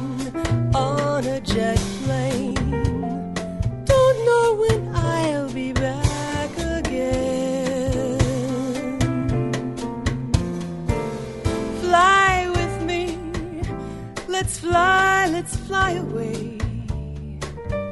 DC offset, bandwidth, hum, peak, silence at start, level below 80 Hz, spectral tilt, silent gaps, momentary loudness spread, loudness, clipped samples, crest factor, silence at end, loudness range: under 0.1%; 11.5 kHz; none; -2 dBFS; 0 s; -34 dBFS; -5.5 dB/octave; none; 12 LU; -22 LUFS; under 0.1%; 20 dB; 0 s; 3 LU